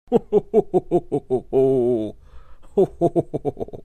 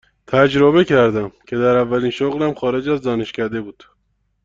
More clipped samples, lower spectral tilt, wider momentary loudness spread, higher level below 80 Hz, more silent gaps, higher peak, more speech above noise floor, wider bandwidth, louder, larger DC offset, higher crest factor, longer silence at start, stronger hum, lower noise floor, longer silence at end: neither; first, -9.5 dB/octave vs -7 dB/octave; second, 9 LU vs 12 LU; about the same, -46 dBFS vs -50 dBFS; neither; about the same, -4 dBFS vs -2 dBFS; second, 19 dB vs 50 dB; first, 9.4 kHz vs 7.6 kHz; second, -21 LUFS vs -17 LUFS; neither; about the same, 18 dB vs 16 dB; second, 0.1 s vs 0.3 s; neither; second, -40 dBFS vs -66 dBFS; second, 0 s vs 0.75 s